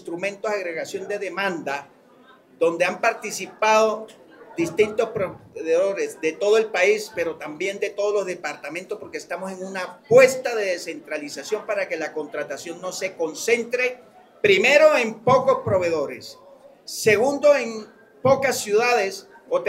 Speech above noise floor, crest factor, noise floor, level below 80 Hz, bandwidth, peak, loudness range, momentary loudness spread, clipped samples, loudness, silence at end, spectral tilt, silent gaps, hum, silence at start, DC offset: 30 dB; 22 dB; -52 dBFS; -66 dBFS; 16 kHz; -2 dBFS; 6 LU; 14 LU; under 0.1%; -22 LUFS; 0 s; -3.5 dB/octave; none; none; 0.05 s; under 0.1%